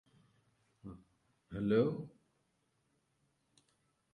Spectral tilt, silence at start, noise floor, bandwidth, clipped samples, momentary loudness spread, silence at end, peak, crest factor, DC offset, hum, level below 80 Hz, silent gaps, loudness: -9 dB/octave; 0.85 s; -79 dBFS; 10 kHz; under 0.1%; 22 LU; 2.05 s; -18 dBFS; 22 dB; under 0.1%; none; -68 dBFS; none; -35 LUFS